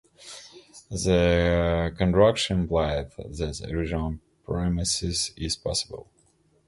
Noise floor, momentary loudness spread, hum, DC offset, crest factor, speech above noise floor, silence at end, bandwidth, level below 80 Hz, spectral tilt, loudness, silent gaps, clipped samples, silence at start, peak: -64 dBFS; 19 LU; none; under 0.1%; 20 dB; 39 dB; 0.65 s; 11.5 kHz; -38 dBFS; -5 dB/octave; -25 LUFS; none; under 0.1%; 0.2 s; -6 dBFS